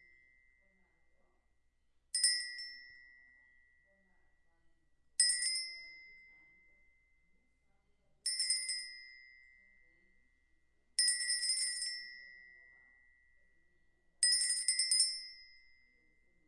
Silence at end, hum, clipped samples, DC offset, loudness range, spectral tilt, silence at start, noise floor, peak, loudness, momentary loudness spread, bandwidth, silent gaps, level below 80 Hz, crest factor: 0.95 s; none; under 0.1%; under 0.1%; 6 LU; 6 dB/octave; 2.15 s; -75 dBFS; -16 dBFS; -33 LUFS; 22 LU; 11.5 kHz; none; -78 dBFS; 24 dB